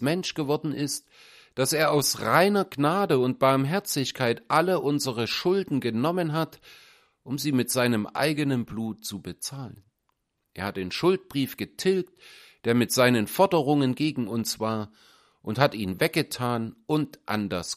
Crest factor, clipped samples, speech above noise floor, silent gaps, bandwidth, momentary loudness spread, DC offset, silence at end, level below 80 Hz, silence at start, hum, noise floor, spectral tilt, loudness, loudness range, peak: 22 dB; under 0.1%; 51 dB; none; 15.5 kHz; 12 LU; under 0.1%; 0 s; -64 dBFS; 0 s; none; -76 dBFS; -4.5 dB/octave; -26 LUFS; 6 LU; -4 dBFS